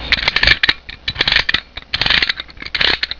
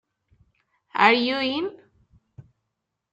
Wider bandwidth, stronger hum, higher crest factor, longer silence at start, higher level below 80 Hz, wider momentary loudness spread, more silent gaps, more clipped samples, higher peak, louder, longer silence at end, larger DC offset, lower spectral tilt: second, 5.4 kHz vs 8 kHz; neither; second, 18 dB vs 24 dB; second, 0 s vs 0.95 s; first, -32 dBFS vs -68 dBFS; about the same, 12 LU vs 14 LU; neither; neither; about the same, 0 dBFS vs -2 dBFS; first, -14 LUFS vs -22 LUFS; second, 0 s vs 0.7 s; neither; second, -2.5 dB/octave vs -5 dB/octave